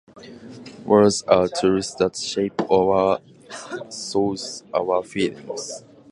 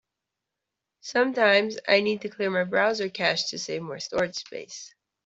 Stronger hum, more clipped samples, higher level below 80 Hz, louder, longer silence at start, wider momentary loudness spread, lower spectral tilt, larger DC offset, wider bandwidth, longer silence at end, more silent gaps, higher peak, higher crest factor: neither; neither; first, -54 dBFS vs -68 dBFS; first, -21 LUFS vs -25 LUFS; second, 0.15 s vs 1.05 s; first, 21 LU vs 17 LU; about the same, -4.5 dB/octave vs -3.5 dB/octave; neither; first, 11.5 kHz vs 8 kHz; about the same, 0.3 s vs 0.4 s; neither; first, 0 dBFS vs -6 dBFS; about the same, 22 dB vs 20 dB